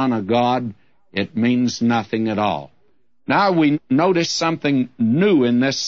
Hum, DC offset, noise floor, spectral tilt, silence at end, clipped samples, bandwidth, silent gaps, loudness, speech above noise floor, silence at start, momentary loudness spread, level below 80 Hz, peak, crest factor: none; 0.2%; -66 dBFS; -5.5 dB/octave; 0 s; under 0.1%; 7.8 kHz; none; -19 LUFS; 48 dB; 0 s; 9 LU; -62 dBFS; -4 dBFS; 14 dB